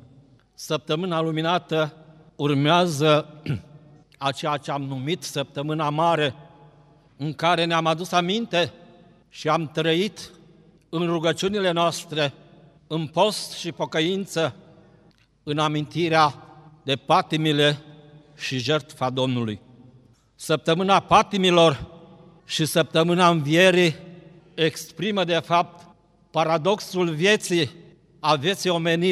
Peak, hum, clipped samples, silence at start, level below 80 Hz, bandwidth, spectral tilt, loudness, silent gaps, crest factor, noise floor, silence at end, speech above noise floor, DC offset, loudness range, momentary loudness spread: -4 dBFS; none; under 0.1%; 0.6 s; -60 dBFS; 14.5 kHz; -5 dB/octave; -23 LUFS; none; 20 dB; -58 dBFS; 0 s; 35 dB; under 0.1%; 5 LU; 12 LU